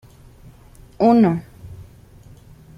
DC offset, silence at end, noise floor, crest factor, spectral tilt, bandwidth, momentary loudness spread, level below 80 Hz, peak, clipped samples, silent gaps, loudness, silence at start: under 0.1%; 0.95 s; -45 dBFS; 18 dB; -9 dB/octave; 6.6 kHz; 26 LU; -50 dBFS; -2 dBFS; under 0.1%; none; -17 LUFS; 1 s